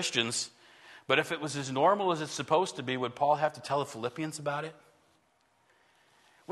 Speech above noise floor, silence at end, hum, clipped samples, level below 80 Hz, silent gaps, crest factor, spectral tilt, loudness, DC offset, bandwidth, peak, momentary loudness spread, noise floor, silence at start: 39 dB; 0 s; none; under 0.1%; -76 dBFS; none; 24 dB; -3.5 dB/octave; -31 LUFS; under 0.1%; 12.5 kHz; -10 dBFS; 9 LU; -70 dBFS; 0 s